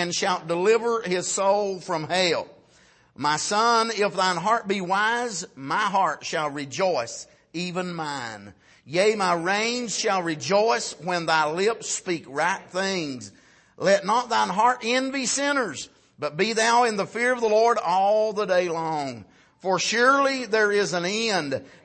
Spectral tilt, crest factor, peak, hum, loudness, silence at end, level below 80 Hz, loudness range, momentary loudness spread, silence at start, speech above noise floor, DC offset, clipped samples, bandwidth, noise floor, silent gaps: -3 dB/octave; 16 dB; -8 dBFS; none; -23 LUFS; 0.15 s; -70 dBFS; 4 LU; 11 LU; 0 s; 34 dB; under 0.1%; under 0.1%; 8.8 kHz; -57 dBFS; none